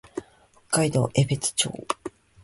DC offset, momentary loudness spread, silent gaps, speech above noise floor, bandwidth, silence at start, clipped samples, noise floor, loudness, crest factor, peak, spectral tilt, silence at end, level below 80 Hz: under 0.1%; 16 LU; none; 33 dB; 11.5 kHz; 0.15 s; under 0.1%; -57 dBFS; -25 LUFS; 20 dB; -6 dBFS; -4 dB/octave; 0.35 s; -56 dBFS